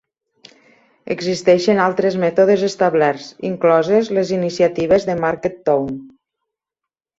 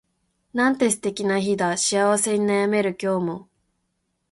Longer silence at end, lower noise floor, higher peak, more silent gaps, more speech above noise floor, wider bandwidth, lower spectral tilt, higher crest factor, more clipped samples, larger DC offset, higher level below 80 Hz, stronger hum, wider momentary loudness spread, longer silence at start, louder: first, 1.1 s vs 0.9 s; first, -85 dBFS vs -74 dBFS; first, -2 dBFS vs -6 dBFS; neither; first, 69 dB vs 52 dB; second, 8 kHz vs 12 kHz; first, -6 dB/octave vs -4 dB/octave; about the same, 16 dB vs 16 dB; neither; neither; first, -56 dBFS vs -64 dBFS; neither; first, 9 LU vs 6 LU; first, 1.05 s vs 0.55 s; first, -17 LUFS vs -22 LUFS